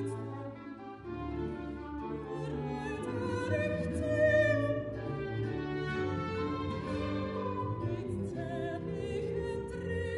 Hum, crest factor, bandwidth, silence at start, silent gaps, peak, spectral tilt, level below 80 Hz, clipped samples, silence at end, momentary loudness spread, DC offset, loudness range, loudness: none; 18 dB; 11.5 kHz; 0 s; none; -16 dBFS; -7.5 dB/octave; -50 dBFS; under 0.1%; 0 s; 12 LU; under 0.1%; 5 LU; -35 LUFS